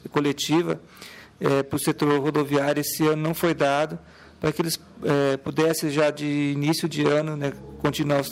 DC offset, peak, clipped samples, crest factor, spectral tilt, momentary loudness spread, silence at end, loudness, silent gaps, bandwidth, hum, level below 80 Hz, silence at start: under 0.1%; -6 dBFS; under 0.1%; 18 dB; -5 dB/octave; 7 LU; 0 s; -24 LUFS; none; 16 kHz; none; -56 dBFS; 0.05 s